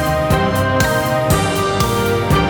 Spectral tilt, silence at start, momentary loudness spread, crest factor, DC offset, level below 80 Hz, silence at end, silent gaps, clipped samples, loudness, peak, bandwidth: -5 dB/octave; 0 s; 1 LU; 14 dB; under 0.1%; -30 dBFS; 0 s; none; under 0.1%; -16 LUFS; -2 dBFS; over 20 kHz